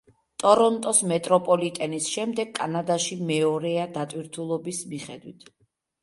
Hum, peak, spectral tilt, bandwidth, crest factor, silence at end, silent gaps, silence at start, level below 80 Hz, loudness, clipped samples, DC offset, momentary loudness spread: none; -4 dBFS; -4 dB/octave; 11.5 kHz; 22 dB; 0.7 s; none; 0.4 s; -70 dBFS; -24 LUFS; under 0.1%; under 0.1%; 14 LU